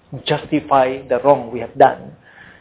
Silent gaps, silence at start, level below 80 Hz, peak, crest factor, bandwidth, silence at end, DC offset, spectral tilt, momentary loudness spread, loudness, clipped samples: none; 0.1 s; -52 dBFS; 0 dBFS; 18 dB; 4 kHz; 0.5 s; under 0.1%; -10 dB/octave; 8 LU; -16 LUFS; under 0.1%